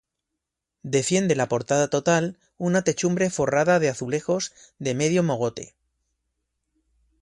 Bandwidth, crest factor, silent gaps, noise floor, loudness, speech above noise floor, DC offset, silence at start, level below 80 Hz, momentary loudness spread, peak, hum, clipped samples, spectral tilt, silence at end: 11.5 kHz; 18 dB; none; -83 dBFS; -23 LUFS; 60 dB; under 0.1%; 0.85 s; -60 dBFS; 11 LU; -8 dBFS; none; under 0.1%; -5 dB/octave; 1.55 s